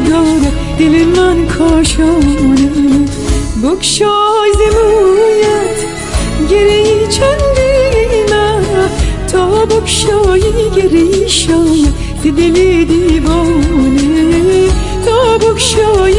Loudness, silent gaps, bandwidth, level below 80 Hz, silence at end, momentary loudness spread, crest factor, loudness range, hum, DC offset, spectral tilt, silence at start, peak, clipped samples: -10 LUFS; none; 11.5 kHz; -20 dBFS; 0 s; 5 LU; 8 dB; 1 LU; none; under 0.1%; -5 dB/octave; 0 s; 0 dBFS; under 0.1%